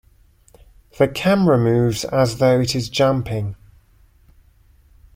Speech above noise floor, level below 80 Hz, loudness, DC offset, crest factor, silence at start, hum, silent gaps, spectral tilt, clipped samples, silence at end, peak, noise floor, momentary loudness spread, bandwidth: 36 dB; -46 dBFS; -18 LUFS; under 0.1%; 18 dB; 1 s; none; none; -6 dB/octave; under 0.1%; 1.6 s; -2 dBFS; -53 dBFS; 8 LU; 16.5 kHz